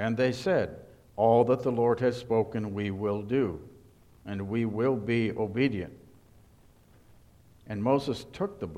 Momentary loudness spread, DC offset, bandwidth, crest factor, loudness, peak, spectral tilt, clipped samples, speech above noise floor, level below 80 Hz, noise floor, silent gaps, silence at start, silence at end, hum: 14 LU; under 0.1%; 13.5 kHz; 20 dB; -28 LUFS; -10 dBFS; -7.5 dB/octave; under 0.1%; 30 dB; -58 dBFS; -58 dBFS; none; 0 s; 0 s; none